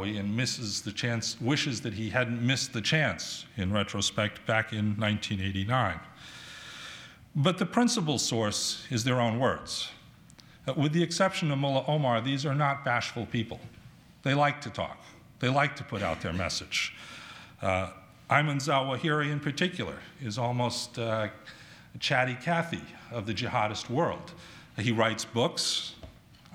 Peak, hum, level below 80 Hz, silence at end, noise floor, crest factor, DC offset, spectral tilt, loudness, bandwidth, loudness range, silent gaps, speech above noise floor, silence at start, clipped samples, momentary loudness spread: -6 dBFS; none; -60 dBFS; 0 s; -54 dBFS; 24 dB; under 0.1%; -4.5 dB/octave; -29 LUFS; 16 kHz; 3 LU; none; 25 dB; 0 s; under 0.1%; 15 LU